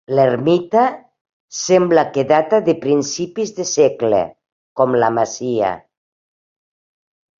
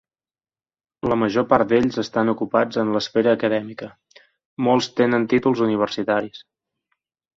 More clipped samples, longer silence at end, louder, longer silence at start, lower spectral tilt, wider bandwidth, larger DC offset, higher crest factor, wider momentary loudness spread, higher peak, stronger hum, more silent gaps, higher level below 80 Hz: neither; first, 1.6 s vs 1 s; first, -16 LUFS vs -20 LUFS; second, 0.1 s vs 1.05 s; about the same, -5 dB/octave vs -6 dB/octave; about the same, 7.6 kHz vs 7.8 kHz; neither; about the same, 16 dB vs 20 dB; about the same, 10 LU vs 10 LU; about the same, -2 dBFS vs 0 dBFS; neither; first, 1.21-1.25 s, 1.33-1.48 s, 4.52-4.76 s vs 4.45-4.57 s; about the same, -60 dBFS vs -56 dBFS